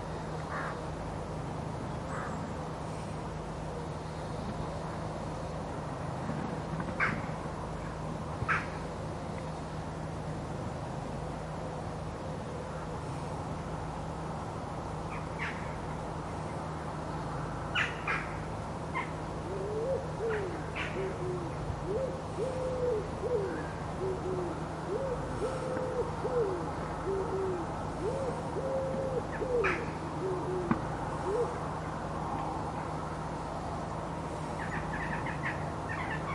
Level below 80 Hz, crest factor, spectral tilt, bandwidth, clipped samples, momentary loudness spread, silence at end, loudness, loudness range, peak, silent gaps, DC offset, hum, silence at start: -48 dBFS; 24 dB; -6.5 dB/octave; 11.5 kHz; under 0.1%; 7 LU; 0 s; -36 LUFS; 5 LU; -12 dBFS; none; under 0.1%; none; 0 s